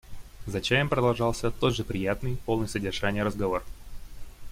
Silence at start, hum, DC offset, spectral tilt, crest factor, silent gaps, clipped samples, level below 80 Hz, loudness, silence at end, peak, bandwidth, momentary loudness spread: 0.05 s; none; under 0.1%; -5.5 dB/octave; 20 dB; none; under 0.1%; -42 dBFS; -28 LUFS; 0 s; -8 dBFS; 16.5 kHz; 10 LU